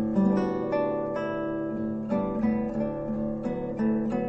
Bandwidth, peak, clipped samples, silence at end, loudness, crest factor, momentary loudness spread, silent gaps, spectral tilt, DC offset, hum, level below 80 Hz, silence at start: 6 kHz; -12 dBFS; under 0.1%; 0 s; -28 LUFS; 14 dB; 6 LU; none; -9.5 dB/octave; under 0.1%; none; -50 dBFS; 0 s